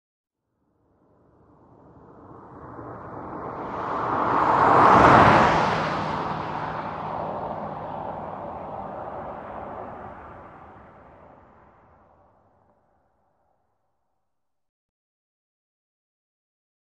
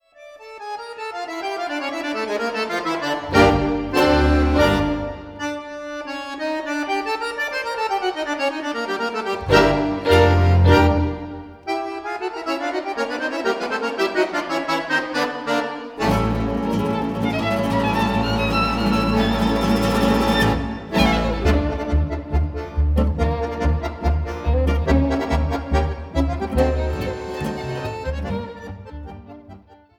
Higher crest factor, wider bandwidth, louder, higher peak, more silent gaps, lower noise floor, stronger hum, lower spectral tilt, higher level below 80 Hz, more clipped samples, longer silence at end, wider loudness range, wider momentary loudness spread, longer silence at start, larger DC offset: about the same, 24 dB vs 20 dB; second, 10.5 kHz vs 17 kHz; about the same, -21 LUFS vs -21 LUFS; about the same, -2 dBFS vs -2 dBFS; neither; first, -84 dBFS vs -45 dBFS; neither; about the same, -6.5 dB/octave vs -6.5 dB/octave; second, -50 dBFS vs -28 dBFS; neither; first, 6.2 s vs 0.25 s; first, 22 LU vs 7 LU; first, 25 LU vs 13 LU; first, 2.15 s vs 0.2 s; neither